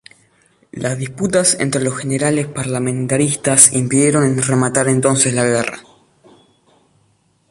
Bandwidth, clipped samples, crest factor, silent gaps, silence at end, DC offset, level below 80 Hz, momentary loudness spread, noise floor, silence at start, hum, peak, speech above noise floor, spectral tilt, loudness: 16 kHz; under 0.1%; 18 dB; none; 1.7 s; under 0.1%; -52 dBFS; 13 LU; -59 dBFS; 0.75 s; none; 0 dBFS; 43 dB; -4 dB/octave; -15 LUFS